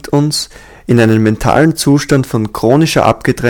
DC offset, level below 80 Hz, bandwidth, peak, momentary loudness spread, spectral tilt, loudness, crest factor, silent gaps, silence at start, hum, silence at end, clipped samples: under 0.1%; -34 dBFS; 18 kHz; 0 dBFS; 7 LU; -5.5 dB/octave; -11 LUFS; 12 dB; none; 0.05 s; none; 0 s; 0.4%